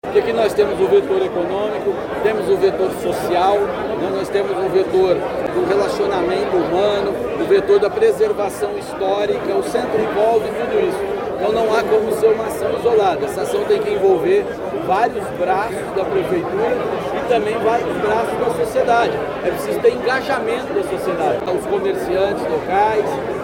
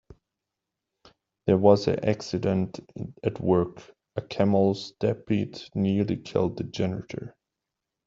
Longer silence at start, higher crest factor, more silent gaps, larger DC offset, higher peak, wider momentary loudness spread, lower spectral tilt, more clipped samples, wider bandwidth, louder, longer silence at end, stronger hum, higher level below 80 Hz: second, 0.05 s vs 1.45 s; second, 14 dB vs 22 dB; neither; neither; about the same, -4 dBFS vs -4 dBFS; second, 6 LU vs 16 LU; second, -5.5 dB/octave vs -7.5 dB/octave; neither; first, 17 kHz vs 7.6 kHz; first, -18 LUFS vs -26 LUFS; second, 0 s vs 0.75 s; neither; first, -46 dBFS vs -60 dBFS